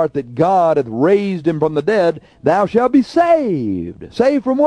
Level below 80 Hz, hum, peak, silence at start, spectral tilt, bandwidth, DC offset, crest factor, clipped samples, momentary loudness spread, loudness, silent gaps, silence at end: -50 dBFS; none; -2 dBFS; 0 s; -7.5 dB/octave; 10.5 kHz; under 0.1%; 14 dB; under 0.1%; 7 LU; -15 LUFS; none; 0 s